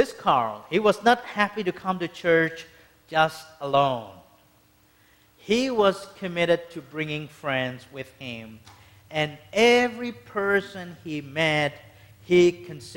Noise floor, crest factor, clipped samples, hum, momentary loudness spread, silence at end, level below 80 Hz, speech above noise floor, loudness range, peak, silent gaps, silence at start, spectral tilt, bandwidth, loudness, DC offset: -60 dBFS; 20 dB; under 0.1%; none; 17 LU; 0 s; -62 dBFS; 35 dB; 4 LU; -6 dBFS; none; 0 s; -5 dB/octave; 16.5 kHz; -24 LUFS; under 0.1%